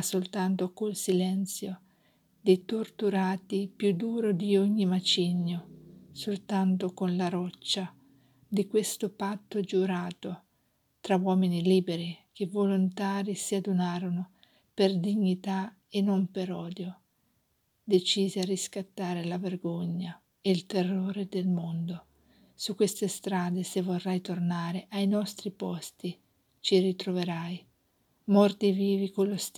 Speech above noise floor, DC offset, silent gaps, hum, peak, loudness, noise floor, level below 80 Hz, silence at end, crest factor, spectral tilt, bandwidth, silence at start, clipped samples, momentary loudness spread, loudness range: 45 dB; under 0.1%; none; none; -10 dBFS; -30 LUFS; -74 dBFS; -78 dBFS; 0.1 s; 20 dB; -5.5 dB/octave; 15 kHz; 0 s; under 0.1%; 12 LU; 4 LU